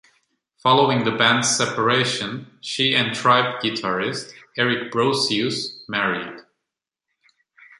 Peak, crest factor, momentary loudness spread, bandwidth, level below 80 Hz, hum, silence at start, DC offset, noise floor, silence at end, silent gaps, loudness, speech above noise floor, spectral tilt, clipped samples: -2 dBFS; 20 dB; 12 LU; 11.5 kHz; -64 dBFS; none; 0.65 s; under 0.1%; -84 dBFS; 1.4 s; none; -20 LUFS; 63 dB; -3 dB/octave; under 0.1%